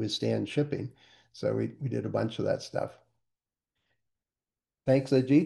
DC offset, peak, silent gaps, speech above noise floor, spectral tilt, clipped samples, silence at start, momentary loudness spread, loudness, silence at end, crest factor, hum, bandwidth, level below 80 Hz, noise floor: under 0.1%; -12 dBFS; none; over 61 dB; -7 dB/octave; under 0.1%; 0 s; 11 LU; -30 LUFS; 0 s; 20 dB; none; 11.5 kHz; -70 dBFS; under -90 dBFS